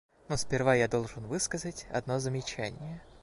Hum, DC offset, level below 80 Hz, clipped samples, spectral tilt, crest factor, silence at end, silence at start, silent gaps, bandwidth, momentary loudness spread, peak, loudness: none; under 0.1%; -54 dBFS; under 0.1%; -4.5 dB/octave; 20 dB; 0.05 s; 0.3 s; none; 11.5 kHz; 11 LU; -12 dBFS; -32 LUFS